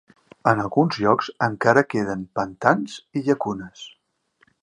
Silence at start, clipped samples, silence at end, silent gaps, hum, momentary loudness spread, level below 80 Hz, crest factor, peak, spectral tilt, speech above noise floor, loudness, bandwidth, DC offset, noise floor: 0.45 s; under 0.1%; 0.75 s; none; none; 12 LU; -60 dBFS; 22 dB; 0 dBFS; -6.5 dB/octave; 43 dB; -22 LUFS; 10 kHz; under 0.1%; -64 dBFS